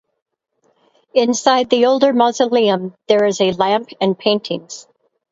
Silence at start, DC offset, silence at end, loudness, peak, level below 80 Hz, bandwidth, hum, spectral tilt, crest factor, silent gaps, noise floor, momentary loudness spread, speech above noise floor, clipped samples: 1.15 s; under 0.1%; 0.5 s; -16 LUFS; 0 dBFS; -62 dBFS; 8 kHz; none; -4 dB/octave; 16 dB; none; -63 dBFS; 9 LU; 48 dB; under 0.1%